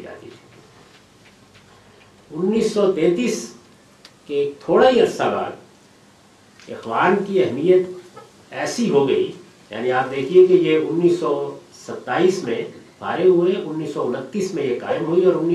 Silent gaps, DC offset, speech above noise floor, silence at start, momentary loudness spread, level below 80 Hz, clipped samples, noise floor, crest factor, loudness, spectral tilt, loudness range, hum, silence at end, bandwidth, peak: none; under 0.1%; 32 dB; 0 s; 18 LU; -62 dBFS; under 0.1%; -51 dBFS; 18 dB; -19 LUFS; -6 dB/octave; 5 LU; none; 0 s; 12 kHz; -2 dBFS